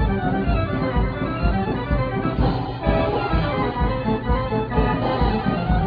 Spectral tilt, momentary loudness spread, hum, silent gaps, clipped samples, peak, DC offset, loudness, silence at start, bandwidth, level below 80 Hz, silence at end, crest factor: -10 dB/octave; 2 LU; none; none; under 0.1%; -4 dBFS; under 0.1%; -22 LUFS; 0 s; 5.2 kHz; -26 dBFS; 0 s; 16 dB